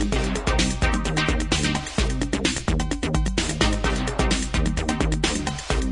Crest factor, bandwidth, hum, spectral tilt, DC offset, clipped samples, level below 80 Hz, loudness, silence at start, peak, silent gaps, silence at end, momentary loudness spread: 16 dB; 11 kHz; none; -4 dB/octave; under 0.1%; under 0.1%; -26 dBFS; -23 LUFS; 0 s; -6 dBFS; none; 0 s; 3 LU